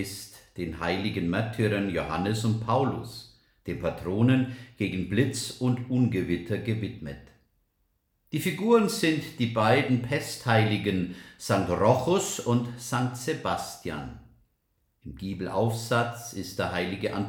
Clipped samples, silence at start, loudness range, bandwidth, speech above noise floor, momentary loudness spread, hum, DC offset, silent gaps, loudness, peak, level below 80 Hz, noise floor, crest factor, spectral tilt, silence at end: under 0.1%; 0 s; 6 LU; 18 kHz; 46 dB; 14 LU; none; under 0.1%; none; -27 LUFS; -8 dBFS; -56 dBFS; -73 dBFS; 20 dB; -5.5 dB/octave; 0 s